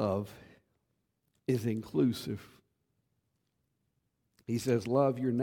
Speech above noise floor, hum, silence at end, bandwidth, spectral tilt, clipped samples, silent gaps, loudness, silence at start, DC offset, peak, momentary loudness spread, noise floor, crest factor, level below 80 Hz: 49 dB; none; 0 s; 17.5 kHz; -7 dB/octave; under 0.1%; none; -32 LUFS; 0 s; under 0.1%; -14 dBFS; 14 LU; -80 dBFS; 20 dB; -70 dBFS